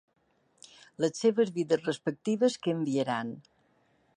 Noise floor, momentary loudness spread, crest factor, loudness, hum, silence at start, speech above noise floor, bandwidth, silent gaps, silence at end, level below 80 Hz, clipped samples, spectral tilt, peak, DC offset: -69 dBFS; 10 LU; 18 dB; -30 LUFS; none; 1 s; 40 dB; 10.5 kHz; none; 0.75 s; -80 dBFS; under 0.1%; -5.5 dB/octave; -14 dBFS; under 0.1%